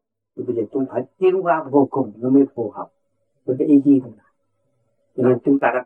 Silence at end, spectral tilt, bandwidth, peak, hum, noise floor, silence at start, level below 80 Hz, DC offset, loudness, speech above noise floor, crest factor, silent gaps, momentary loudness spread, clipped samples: 0 s; -10.5 dB/octave; 3.3 kHz; -4 dBFS; none; -71 dBFS; 0.35 s; -76 dBFS; under 0.1%; -19 LUFS; 53 dB; 16 dB; none; 15 LU; under 0.1%